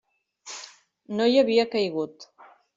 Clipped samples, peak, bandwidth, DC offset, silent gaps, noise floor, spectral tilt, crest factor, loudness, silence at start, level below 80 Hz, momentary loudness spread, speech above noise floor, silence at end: under 0.1%; -8 dBFS; 7.8 kHz; under 0.1%; none; -48 dBFS; -4.5 dB/octave; 18 dB; -24 LUFS; 0.45 s; -72 dBFS; 19 LU; 25 dB; 0.5 s